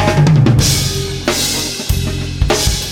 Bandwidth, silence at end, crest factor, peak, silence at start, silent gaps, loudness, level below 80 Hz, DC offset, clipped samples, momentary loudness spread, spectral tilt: 17.5 kHz; 0 s; 14 dB; 0 dBFS; 0 s; none; -14 LUFS; -24 dBFS; under 0.1%; under 0.1%; 8 LU; -4.5 dB/octave